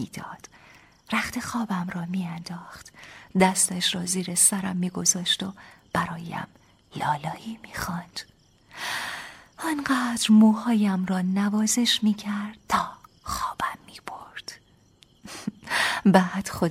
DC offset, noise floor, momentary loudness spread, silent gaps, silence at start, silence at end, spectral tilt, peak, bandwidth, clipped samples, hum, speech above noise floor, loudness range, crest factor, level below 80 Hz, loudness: under 0.1%; -58 dBFS; 20 LU; none; 0 s; 0 s; -3.5 dB/octave; -4 dBFS; 16 kHz; under 0.1%; none; 33 dB; 10 LU; 22 dB; -56 dBFS; -24 LUFS